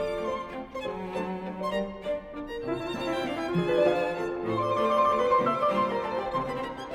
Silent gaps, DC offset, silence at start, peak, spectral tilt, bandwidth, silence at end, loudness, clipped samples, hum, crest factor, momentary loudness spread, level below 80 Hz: none; under 0.1%; 0 s; -12 dBFS; -6.5 dB/octave; 15 kHz; 0 s; -29 LUFS; under 0.1%; none; 18 dB; 11 LU; -54 dBFS